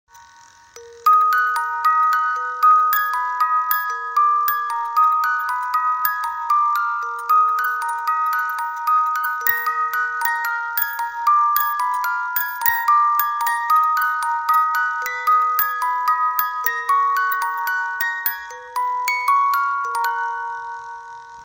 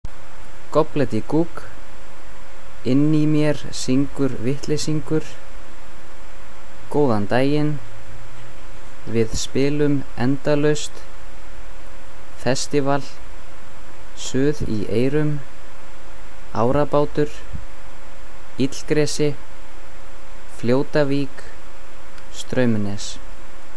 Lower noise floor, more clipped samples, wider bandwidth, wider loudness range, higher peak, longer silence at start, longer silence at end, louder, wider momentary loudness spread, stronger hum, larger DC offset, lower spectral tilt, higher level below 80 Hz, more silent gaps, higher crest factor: first, -48 dBFS vs -42 dBFS; neither; first, 16.5 kHz vs 11 kHz; about the same, 3 LU vs 4 LU; about the same, -2 dBFS vs -4 dBFS; first, 0.15 s vs 0 s; about the same, 0 s vs 0 s; first, -19 LUFS vs -22 LUFS; second, 7 LU vs 24 LU; neither; second, under 0.1% vs 10%; second, 1.5 dB/octave vs -6 dB/octave; second, -68 dBFS vs -42 dBFS; neither; about the same, 18 dB vs 18 dB